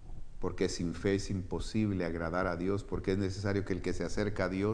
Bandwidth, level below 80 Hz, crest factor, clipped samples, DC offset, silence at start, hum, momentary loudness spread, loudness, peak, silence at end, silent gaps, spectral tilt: 10.5 kHz; -44 dBFS; 16 dB; under 0.1%; under 0.1%; 0 s; none; 4 LU; -34 LUFS; -16 dBFS; 0 s; none; -6 dB/octave